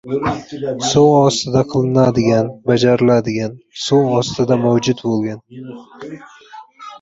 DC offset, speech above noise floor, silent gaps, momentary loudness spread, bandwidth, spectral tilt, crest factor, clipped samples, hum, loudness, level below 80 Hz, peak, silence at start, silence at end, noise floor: under 0.1%; 23 dB; none; 21 LU; 8 kHz; -6 dB/octave; 14 dB; under 0.1%; none; -15 LUFS; -48 dBFS; -2 dBFS; 0.05 s; 0.05 s; -39 dBFS